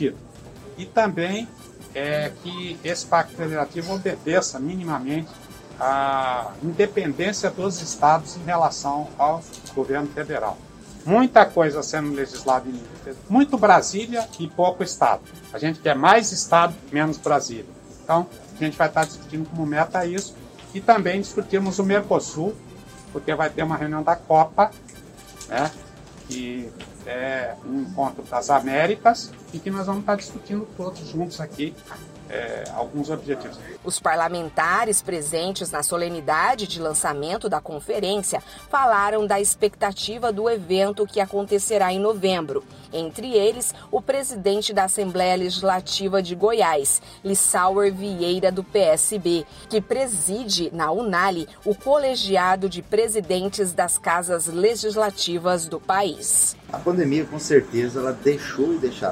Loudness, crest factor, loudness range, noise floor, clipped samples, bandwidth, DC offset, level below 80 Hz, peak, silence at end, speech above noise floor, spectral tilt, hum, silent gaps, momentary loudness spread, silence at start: -22 LUFS; 22 dB; 5 LU; -43 dBFS; under 0.1%; 16 kHz; under 0.1%; -54 dBFS; 0 dBFS; 0 s; 21 dB; -3.5 dB/octave; none; none; 12 LU; 0 s